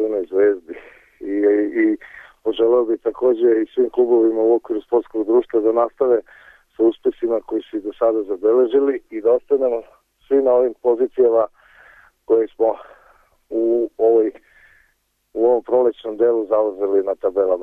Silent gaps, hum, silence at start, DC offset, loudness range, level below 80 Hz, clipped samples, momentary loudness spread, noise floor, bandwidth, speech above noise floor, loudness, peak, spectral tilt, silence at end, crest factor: none; none; 0 s; under 0.1%; 3 LU; -60 dBFS; under 0.1%; 9 LU; -65 dBFS; 3.7 kHz; 48 dB; -19 LUFS; -6 dBFS; -7.5 dB/octave; 0 s; 12 dB